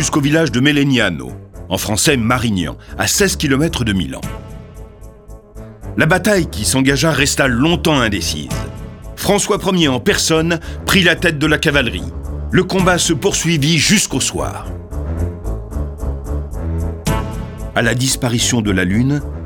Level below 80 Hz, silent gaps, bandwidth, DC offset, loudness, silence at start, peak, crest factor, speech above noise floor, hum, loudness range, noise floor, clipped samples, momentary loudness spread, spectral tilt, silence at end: -30 dBFS; none; 19 kHz; under 0.1%; -15 LUFS; 0 s; 0 dBFS; 16 dB; 22 dB; none; 5 LU; -37 dBFS; under 0.1%; 14 LU; -4 dB/octave; 0 s